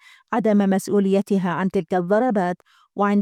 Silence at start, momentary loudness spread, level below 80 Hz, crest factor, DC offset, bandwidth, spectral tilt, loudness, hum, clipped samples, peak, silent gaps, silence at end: 0.3 s; 8 LU; -64 dBFS; 14 dB; under 0.1%; 14 kHz; -7.5 dB/octave; -21 LUFS; none; under 0.1%; -8 dBFS; none; 0 s